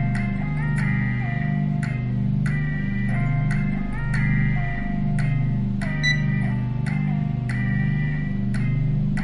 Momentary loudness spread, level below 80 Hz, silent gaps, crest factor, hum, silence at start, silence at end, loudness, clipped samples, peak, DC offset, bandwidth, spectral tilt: 4 LU; -32 dBFS; none; 12 dB; 50 Hz at -30 dBFS; 0 s; 0 s; -24 LUFS; under 0.1%; -10 dBFS; 0.2%; 10.5 kHz; -7.5 dB/octave